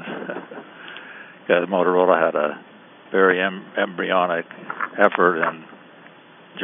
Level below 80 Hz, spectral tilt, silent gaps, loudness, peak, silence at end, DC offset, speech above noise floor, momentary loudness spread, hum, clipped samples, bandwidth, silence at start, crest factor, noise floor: -80 dBFS; -3 dB/octave; none; -20 LUFS; 0 dBFS; 0 s; under 0.1%; 27 dB; 21 LU; none; under 0.1%; 3.8 kHz; 0 s; 22 dB; -47 dBFS